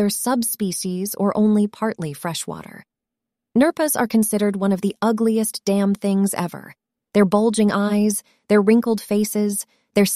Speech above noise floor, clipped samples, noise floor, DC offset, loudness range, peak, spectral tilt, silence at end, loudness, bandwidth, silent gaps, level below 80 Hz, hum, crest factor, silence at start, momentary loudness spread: 65 dB; under 0.1%; -84 dBFS; under 0.1%; 3 LU; -4 dBFS; -5 dB/octave; 0 s; -20 LUFS; 16 kHz; none; -62 dBFS; none; 16 dB; 0 s; 9 LU